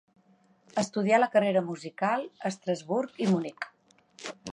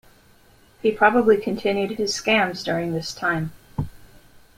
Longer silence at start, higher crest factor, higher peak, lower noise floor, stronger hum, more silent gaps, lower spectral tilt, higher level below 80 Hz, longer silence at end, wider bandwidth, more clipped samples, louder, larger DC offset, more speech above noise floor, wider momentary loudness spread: about the same, 0.75 s vs 0.85 s; about the same, 20 dB vs 20 dB; second, -10 dBFS vs -4 dBFS; first, -64 dBFS vs -54 dBFS; neither; neither; about the same, -5.5 dB/octave vs -4.5 dB/octave; second, -76 dBFS vs -50 dBFS; second, 0 s vs 0.6 s; second, 10.5 kHz vs 16 kHz; neither; second, -28 LUFS vs -22 LUFS; neither; about the same, 36 dB vs 33 dB; first, 17 LU vs 14 LU